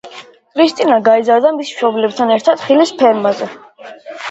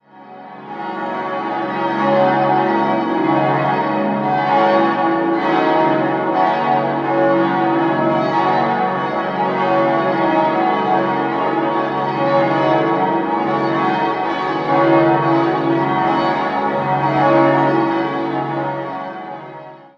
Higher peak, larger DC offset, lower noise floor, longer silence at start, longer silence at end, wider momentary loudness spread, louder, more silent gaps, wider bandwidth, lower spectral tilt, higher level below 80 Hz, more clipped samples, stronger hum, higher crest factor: about the same, 0 dBFS vs -2 dBFS; neither; about the same, -36 dBFS vs -37 dBFS; about the same, 0.05 s vs 0.15 s; about the same, 0 s vs 0.1 s; first, 16 LU vs 8 LU; first, -13 LUFS vs -16 LUFS; neither; first, 8.2 kHz vs 6.6 kHz; second, -4.5 dB/octave vs -8 dB/octave; about the same, -64 dBFS vs -60 dBFS; neither; neither; about the same, 14 dB vs 14 dB